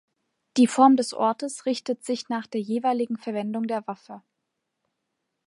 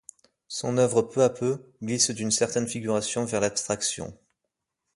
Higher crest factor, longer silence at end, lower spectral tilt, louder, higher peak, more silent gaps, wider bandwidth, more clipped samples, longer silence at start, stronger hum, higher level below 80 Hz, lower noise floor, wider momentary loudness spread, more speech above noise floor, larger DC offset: about the same, 20 dB vs 20 dB; first, 1.25 s vs 0.8 s; about the same, -4.5 dB/octave vs -3.5 dB/octave; about the same, -24 LUFS vs -26 LUFS; about the same, -6 dBFS vs -8 dBFS; neither; about the same, 11.5 kHz vs 11.5 kHz; neither; about the same, 0.55 s vs 0.5 s; neither; second, -80 dBFS vs -62 dBFS; about the same, -80 dBFS vs -83 dBFS; about the same, 12 LU vs 10 LU; about the same, 57 dB vs 57 dB; neither